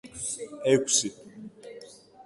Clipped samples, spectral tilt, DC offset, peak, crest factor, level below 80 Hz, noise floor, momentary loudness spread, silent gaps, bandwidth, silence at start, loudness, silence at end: under 0.1%; -2.5 dB/octave; under 0.1%; -8 dBFS; 22 dB; -66 dBFS; -49 dBFS; 24 LU; none; 11.5 kHz; 0.05 s; -26 LUFS; 0.05 s